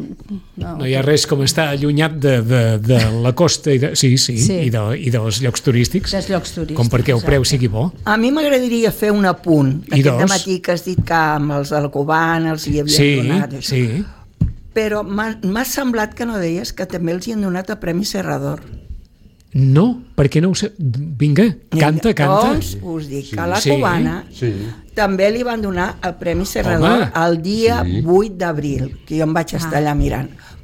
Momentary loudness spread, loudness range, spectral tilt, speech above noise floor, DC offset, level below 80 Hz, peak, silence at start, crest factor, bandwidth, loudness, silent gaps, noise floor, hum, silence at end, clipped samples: 9 LU; 5 LU; -5.5 dB/octave; 30 dB; under 0.1%; -34 dBFS; -2 dBFS; 0 s; 14 dB; 17 kHz; -17 LUFS; none; -46 dBFS; none; 0 s; under 0.1%